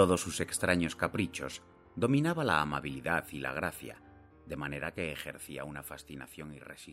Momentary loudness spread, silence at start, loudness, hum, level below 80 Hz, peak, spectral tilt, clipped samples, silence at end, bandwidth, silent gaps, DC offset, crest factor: 17 LU; 0 s; -33 LUFS; none; -58 dBFS; -12 dBFS; -5 dB/octave; under 0.1%; 0 s; 16 kHz; none; under 0.1%; 22 dB